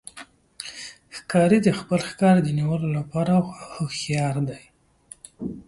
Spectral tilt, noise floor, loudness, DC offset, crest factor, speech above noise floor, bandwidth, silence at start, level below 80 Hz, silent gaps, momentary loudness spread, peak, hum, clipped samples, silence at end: -6.5 dB/octave; -50 dBFS; -22 LUFS; under 0.1%; 18 dB; 28 dB; 11.5 kHz; 0.15 s; -56 dBFS; none; 21 LU; -6 dBFS; none; under 0.1%; 0.05 s